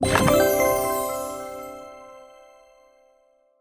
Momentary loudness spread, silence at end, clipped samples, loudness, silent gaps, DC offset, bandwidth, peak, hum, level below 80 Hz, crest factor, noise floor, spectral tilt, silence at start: 22 LU; 1.35 s; under 0.1%; -22 LUFS; none; under 0.1%; 16 kHz; -4 dBFS; none; -44 dBFS; 20 dB; -62 dBFS; -4.5 dB/octave; 0 s